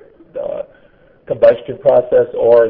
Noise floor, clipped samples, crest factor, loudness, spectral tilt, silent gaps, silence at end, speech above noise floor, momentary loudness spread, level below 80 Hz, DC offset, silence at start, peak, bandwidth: -48 dBFS; under 0.1%; 14 dB; -14 LUFS; -9 dB/octave; none; 0 s; 37 dB; 16 LU; -50 dBFS; under 0.1%; 0.35 s; 0 dBFS; 5.2 kHz